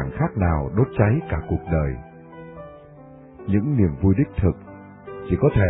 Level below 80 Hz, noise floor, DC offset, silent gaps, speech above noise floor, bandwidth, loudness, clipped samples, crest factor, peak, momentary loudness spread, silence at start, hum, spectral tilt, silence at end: -34 dBFS; -44 dBFS; under 0.1%; none; 24 dB; 3.9 kHz; -22 LUFS; under 0.1%; 18 dB; -4 dBFS; 21 LU; 0 s; none; -13 dB/octave; 0 s